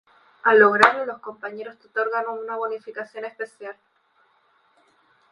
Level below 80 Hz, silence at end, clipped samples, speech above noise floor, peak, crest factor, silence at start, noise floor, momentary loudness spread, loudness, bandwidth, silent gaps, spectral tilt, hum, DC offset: -70 dBFS; 1.6 s; under 0.1%; 41 dB; 0 dBFS; 24 dB; 0.45 s; -63 dBFS; 19 LU; -21 LUFS; 11.5 kHz; none; -4.5 dB/octave; none; under 0.1%